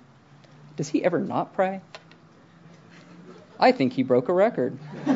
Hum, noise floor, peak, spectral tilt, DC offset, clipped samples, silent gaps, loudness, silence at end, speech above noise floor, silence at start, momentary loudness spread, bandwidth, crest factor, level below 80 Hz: none; -53 dBFS; -4 dBFS; -6.5 dB/octave; under 0.1%; under 0.1%; none; -24 LUFS; 0 s; 30 dB; 0.75 s; 12 LU; 7.8 kHz; 22 dB; -78 dBFS